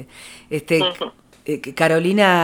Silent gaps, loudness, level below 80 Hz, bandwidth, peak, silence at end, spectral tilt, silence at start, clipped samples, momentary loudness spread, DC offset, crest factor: none; -19 LUFS; -58 dBFS; 17 kHz; 0 dBFS; 0 s; -5 dB/octave; 0 s; under 0.1%; 20 LU; under 0.1%; 20 dB